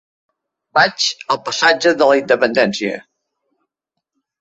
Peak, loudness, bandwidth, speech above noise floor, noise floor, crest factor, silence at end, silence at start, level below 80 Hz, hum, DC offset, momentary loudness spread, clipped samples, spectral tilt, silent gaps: 0 dBFS; -15 LUFS; 8.2 kHz; 64 dB; -79 dBFS; 16 dB; 1.4 s; 0.75 s; -62 dBFS; none; under 0.1%; 9 LU; under 0.1%; -3 dB/octave; none